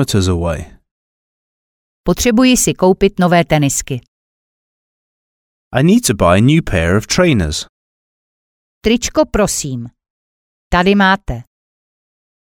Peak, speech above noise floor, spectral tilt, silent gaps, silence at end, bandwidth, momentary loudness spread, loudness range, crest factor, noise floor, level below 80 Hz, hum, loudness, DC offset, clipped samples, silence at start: 0 dBFS; over 77 dB; -5 dB/octave; 0.91-2.04 s, 4.08-5.71 s, 7.69-8.81 s, 10.10-10.71 s; 1.05 s; 18 kHz; 14 LU; 3 LU; 16 dB; under -90 dBFS; -32 dBFS; none; -13 LUFS; under 0.1%; under 0.1%; 0 s